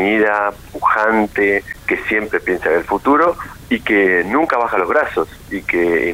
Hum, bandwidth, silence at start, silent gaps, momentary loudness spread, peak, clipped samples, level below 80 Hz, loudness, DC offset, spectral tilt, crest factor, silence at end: none; 16 kHz; 0 s; none; 7 LU; -4 dBFS; under 0.1%; -44 dBFS; -16 LUFS; under 0.1%; -6 dB/octave; 12 dB; 0 s